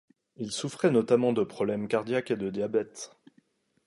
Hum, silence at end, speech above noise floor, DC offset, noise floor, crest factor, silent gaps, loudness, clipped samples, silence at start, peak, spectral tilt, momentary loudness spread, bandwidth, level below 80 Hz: none; 0.8 s; 40 dB; under 0.1%; -67 dBFS; 18 dB; none; -28 LUFS; under 0.1%; 0.4 s; -10 dBFS; -5.5 dB/octave; 15 LU; 11.5 kHz; -70 dBFS